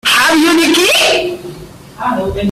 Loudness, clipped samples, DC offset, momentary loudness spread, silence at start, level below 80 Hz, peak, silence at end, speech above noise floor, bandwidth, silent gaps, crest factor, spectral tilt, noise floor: -10 LUFS; under 0.1%; under 0.1%; 14 LU; 0.05 s; -38 dBFS; 0 dBFS; 0 s; 20 dB; 16 kHz; none; 12 dB; -2.5 dB/octave; -31 dBFS